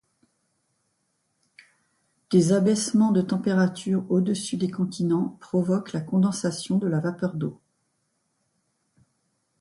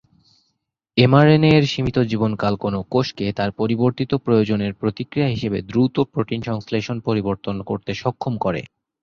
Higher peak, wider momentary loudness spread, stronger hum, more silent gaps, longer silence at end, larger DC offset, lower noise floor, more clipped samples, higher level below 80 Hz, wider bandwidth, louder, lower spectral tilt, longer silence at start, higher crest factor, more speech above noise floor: second, -8 dBFS vs -2 dBFS; second, 7 LU vs 11 LU; neither; neither; first, 2.05 s vs 0.35 s; neither; about the same, -74 dBFS vs -74 dBFS; neither; second, -66 dBFS vs -48 dBFS; first, 11.5 kHz vs 7.2 kHz; second, -24 LUFS vs -20 LUFS; about the same, -6.5 dB/octave vs -7.5 dB/octave; first, 2.3 s vs 0.95 s; about the same, 18 dB vs 18 dB; second, 50 dB vs 55 dB